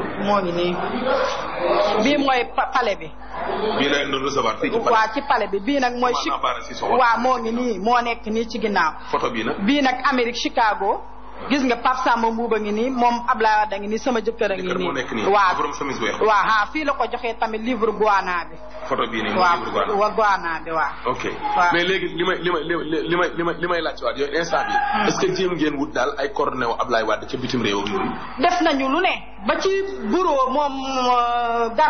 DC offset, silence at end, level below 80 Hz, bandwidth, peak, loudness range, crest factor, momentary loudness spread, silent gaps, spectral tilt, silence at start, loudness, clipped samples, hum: 2%; 0 s; -46 dBFS; 6.6 kHz; -6 dBFS; 1 LU; 14 dB; 6 LU; none; -2.5 dB/octave; 0 s; -21 LUFS; under 0.1%; none